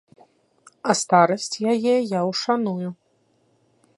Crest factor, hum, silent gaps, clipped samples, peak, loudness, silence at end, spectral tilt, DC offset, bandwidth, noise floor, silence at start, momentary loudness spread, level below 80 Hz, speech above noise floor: 20 dB; none; none; under 0.1%; -2 dBFS; -21 LUFS; 1.05 s; -4.5 dB/octave; under 0.1%; 11.5 kHz; -64 dBFS; 0.85 s; 12 LU; -74 dBFS; 44 dB